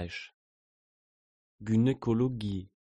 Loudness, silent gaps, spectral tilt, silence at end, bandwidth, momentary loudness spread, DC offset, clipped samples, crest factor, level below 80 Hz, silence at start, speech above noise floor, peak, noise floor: -30 LUFS; 0.34-1.59 s; -8 dB/octave; 0.3 s; 9 kHz; 16 LU; under 0.1%; under 0.1%; 16 dB; -58 dBFS; 0 s; over 60 dB; -16 dBFS; under -90 dBFS